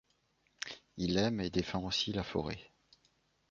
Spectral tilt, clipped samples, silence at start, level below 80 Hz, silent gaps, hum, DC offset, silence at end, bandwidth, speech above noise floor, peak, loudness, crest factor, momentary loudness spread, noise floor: -4 dB/octave; under 0.1%; 0.65 s; -56 dBFS; none; none; under 0.1%; 0.85 s; 7.4 kHz; 40 dB; -18 dBFS; -36 LUFS; 20 dB; 12 LU; -75 dBFS